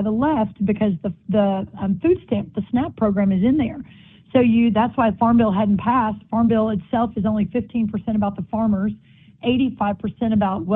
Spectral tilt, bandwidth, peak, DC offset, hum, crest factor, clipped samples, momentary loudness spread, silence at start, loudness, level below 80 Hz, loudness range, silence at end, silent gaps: -11.5 dB/octave; 3.9 kHz; -4 dBFS; under 0.1%; none; 16 dB; under 0.1%; 7 LU; 0 s; -20 LUFS; -46 dBFS; 4 LU; 0 s; none